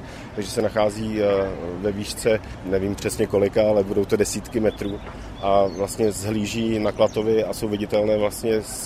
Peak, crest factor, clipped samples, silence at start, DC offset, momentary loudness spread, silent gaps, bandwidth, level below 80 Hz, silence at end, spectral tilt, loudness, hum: -4 dBFS; 18 dB; under 0.1%; 0 s; under 0.1%; 7 LU; none; 15.5 kHz; -42 dBFS; 0 s; -5 dB/octave; -23 LUFS; none